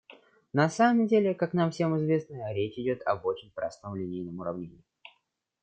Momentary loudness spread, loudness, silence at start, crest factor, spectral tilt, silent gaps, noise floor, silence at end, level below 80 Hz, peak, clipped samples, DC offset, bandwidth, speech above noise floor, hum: 13 LU; -29 LUFS; 0.1 s; 18 dB; -7 dB/octave; none; -75 dBFS; 0.9 s; -70 dBFS; -10 dBFS; under 0.1%; under 0.1%; 9 kHz; 47 dB; none